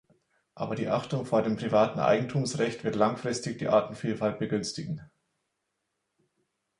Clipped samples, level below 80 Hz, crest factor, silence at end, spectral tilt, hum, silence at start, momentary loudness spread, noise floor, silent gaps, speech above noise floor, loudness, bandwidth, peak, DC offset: under 0.1%; -64 dBFS; 20 dB; 1.75 s; -6 dB/octave; none; 0.55 s; 9 LU; -81 dBFS; none; 53 dB; -29 LUFS; 11.5 kHz; -8 dBFS; under 0.1%